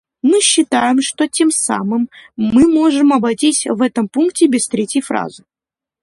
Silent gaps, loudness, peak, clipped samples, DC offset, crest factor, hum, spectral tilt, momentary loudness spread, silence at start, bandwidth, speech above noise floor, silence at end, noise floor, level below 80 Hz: none; -14 LUFS; 0 dBFS; under 0.1%; under 0.1%; 14 dB; none; -3 dB/octave; 9 LU; 0.25 s; 11.5 kHz; 74 dB; 0.65 s; -88 dBFS; -50 dBFS